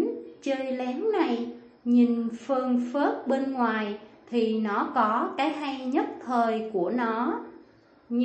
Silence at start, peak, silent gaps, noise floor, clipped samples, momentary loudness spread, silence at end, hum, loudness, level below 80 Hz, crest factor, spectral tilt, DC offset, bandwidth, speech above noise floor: 0 s; -10 dBFS; none; -56 dBFS; under 0.1%; 8 LU; 0 s; none; -27 LUFS; -74 dBFS; 16 dB; -6 dB/octave; under 0.1%; 8.4 kHz; 30 dB